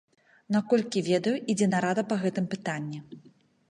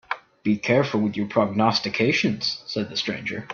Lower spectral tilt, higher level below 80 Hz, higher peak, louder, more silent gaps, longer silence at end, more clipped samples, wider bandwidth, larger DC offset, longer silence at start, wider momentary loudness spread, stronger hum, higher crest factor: about the same, -5.5 dB/octave vs -5.5 dB/octave; second, -74 dBFS vs -62 dBFS; second, -12 dBFS vs -4 dBFS; second, -28 LUFS vs -23 LUFS; neither; first, 0.5 s vs 0 s; neither; first, 11 kHz vs 7 kHz; neither; first, 0.5 s vs 0.1 s; about the same, 9 LU vs 8 LU; neither; about the same, 18 dB vs 20 dB